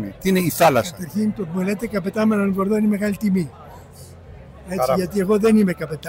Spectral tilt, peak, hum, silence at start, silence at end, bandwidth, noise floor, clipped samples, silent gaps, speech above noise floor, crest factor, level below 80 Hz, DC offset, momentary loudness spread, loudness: -6 dB/octave; -4 dBFS; none; 0 s; 0 s; 16.5 kHz; -41 dBFS; under 0.1%; none; 22 dB; 16 dB; -48 dBFS; under 0.1%; 8 LU; -20 LUFS